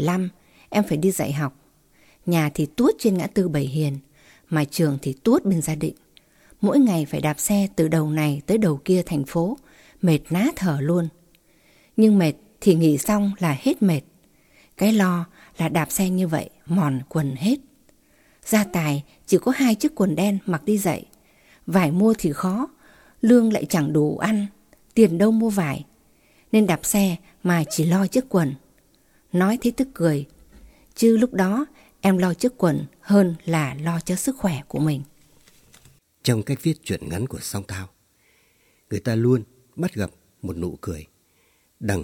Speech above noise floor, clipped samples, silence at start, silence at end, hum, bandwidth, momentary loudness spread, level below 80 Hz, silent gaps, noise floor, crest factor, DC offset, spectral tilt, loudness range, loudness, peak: 42 dB; under 0.1%; 0 s; 0 s; none; 16.5 kHz; 12 LU; -52 dBFS; none; -62 dBFS; 18 dB; under 0.1%; -6 dB/octave; 6 LU; -22 LUFS; -4 dBFS